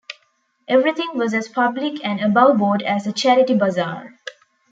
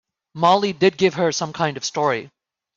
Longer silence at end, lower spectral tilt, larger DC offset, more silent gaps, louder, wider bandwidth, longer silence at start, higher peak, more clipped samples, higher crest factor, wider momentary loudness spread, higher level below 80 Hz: about the same, 0.4 s vs 0.5 s; about the same, -5.5 dB/octave vs -4.5 dB/octave; neither; neither; about the same, -18 LUFS vs -20 LUFS; about the same, 8 kHz vs 7.6 kHz; second, 0.1 s vs 0.35 s; about the same, -2 dBFS vs -4 dBFS; neither; about the same, 18 dB vs 16 dB; first, 21 LU vs 6 LU; second, -68 dBFS vs -62 dBFS